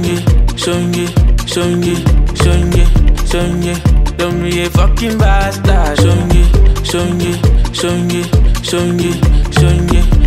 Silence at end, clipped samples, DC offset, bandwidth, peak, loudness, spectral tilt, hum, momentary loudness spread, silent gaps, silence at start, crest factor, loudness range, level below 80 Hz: 0 s; under 0.1%; under 0.1%; 15 kHz; 0 dBFS; -13 LUFS; -6 dB/octave; none; 4 LU; none; 0 s; 10 dB; 1 LU; -12 dBFS